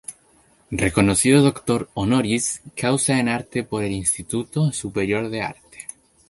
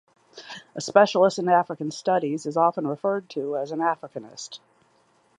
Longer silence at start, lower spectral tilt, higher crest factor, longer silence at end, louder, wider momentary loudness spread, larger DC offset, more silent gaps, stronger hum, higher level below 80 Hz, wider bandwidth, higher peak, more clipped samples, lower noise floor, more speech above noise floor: second, 0.1 s vs 0.35 s; about the same, -4.5 dB/octave vs -5 dB/octave; about the same, 20 dB vs 22 dB; second, 0.45 s vs 0.8 s; about the same, -21 LUFS vs -23 LUFS; second, 14 LU vs 19 LU; neither; neither; neither; first, -46 dBFS vs -78 dBFS; first, 12 kHz vs 10.5 kHz; about the same, -2 dBFS vs -2 dBFS; neither; second, -57 dBFS vs -63 dBFS; about the same, 36 dB vs 39 dB